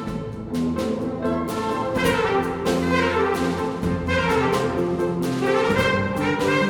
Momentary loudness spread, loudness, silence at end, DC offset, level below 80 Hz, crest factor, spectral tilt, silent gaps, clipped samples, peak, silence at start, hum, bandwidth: 5 LU; -22 LUFS; 0 s; under 0.1%; -42 dBFS; 14 dB; -6 dB/octave; none; under 0.1%; -6 dBFS; 0 s; none; 19 kHz